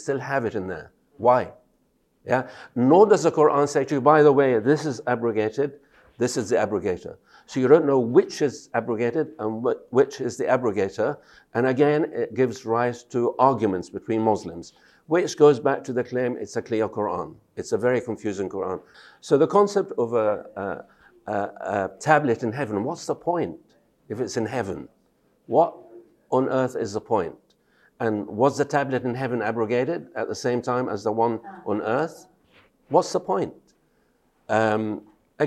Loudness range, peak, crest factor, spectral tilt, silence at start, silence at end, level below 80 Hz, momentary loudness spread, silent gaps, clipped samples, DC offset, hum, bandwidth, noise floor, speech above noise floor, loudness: 7 LU; -2 dBFS; 22 dB; -6 dB/octave; 0 s; 0 s; -66 dBFS; 13 LU; none; under 0.1%; under 0.1%; none; 12 kHz; -67 dBFS; 44 dB; -23 LUFS